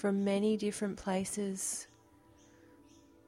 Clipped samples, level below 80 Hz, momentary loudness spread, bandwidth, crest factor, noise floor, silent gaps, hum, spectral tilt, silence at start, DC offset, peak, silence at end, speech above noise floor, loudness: under 0.1%; -68 dBFS; 7 LU; 15.5 kHz; 14 dB; -63 dBFS; none; none; -5 dB/octave; 0 s; under 0.1%; -22 dBFS; 1.45 s; 29 dB; -34 LUFS